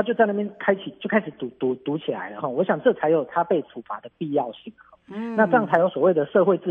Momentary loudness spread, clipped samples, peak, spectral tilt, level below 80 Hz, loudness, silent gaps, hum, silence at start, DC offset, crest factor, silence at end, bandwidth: 14 LU; under 0.1%; -4 dBFS; -9 dB/octave; -72 dBFS; -23 LUFS; none; none; 0 s; under 0.1%; 20 dB; 0 s; 4 kHz